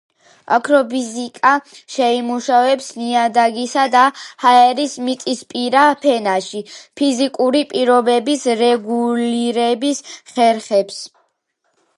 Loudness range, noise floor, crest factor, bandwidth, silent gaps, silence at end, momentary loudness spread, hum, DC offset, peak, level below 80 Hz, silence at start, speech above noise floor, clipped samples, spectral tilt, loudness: 3 LU; -68 dBFS; 16 dB; 11.5 kHz; none; 0.9 s; 9 LU; none; under 0.1%; 0 dBFS; -72 dBFS; 0.5 s; 53 dB; under 0.1%; -3 dB/octave; -16 LUFS